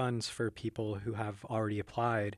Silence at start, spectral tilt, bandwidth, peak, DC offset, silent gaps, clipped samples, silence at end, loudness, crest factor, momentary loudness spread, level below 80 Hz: 0 s; -6 dB/octave; 13 kHz; -18 dBFS; under 0.1%; none; under 0.1%; 0 s; -36 LUFS; 16 dB; 5 LU; -64 dBFS